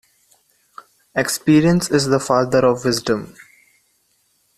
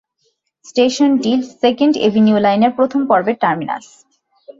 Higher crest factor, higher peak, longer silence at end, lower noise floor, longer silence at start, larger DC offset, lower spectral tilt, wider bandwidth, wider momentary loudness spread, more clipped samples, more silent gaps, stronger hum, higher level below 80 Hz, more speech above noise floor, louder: about the same, 18 dB vs 14 dB; about the same, -2 dBFS vs -2 dBFS; first, 1.25 s vs 0.1 s; about the same, -63 dBFS vs -66 dBFS; first, 1.15 s vs 0.75 s; neither; about the same, -5 dB/octave vs -5.5 dB/octave; first, 14.5 kHz vs 7.8 kHz; about the same, 9 LU vs 8 LU; neither; neither; neither; first, -50 dBFS vs -60 dBFS; second, 47 dB vs 51 dB; about the same, -17 LUFS vs -15 LUFS